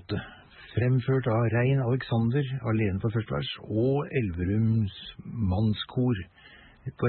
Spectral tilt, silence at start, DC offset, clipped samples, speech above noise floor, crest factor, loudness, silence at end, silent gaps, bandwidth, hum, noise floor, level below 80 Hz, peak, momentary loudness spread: -11.5 dB/octave; 0.1 s; under 0.1%; under 0.1%; 22 dB; 14 dB; -28 LUFS; 0 s; none; 4.3 kHz; none; -49 dBFS; -54 dBFS; -14 dBFS; 10 LU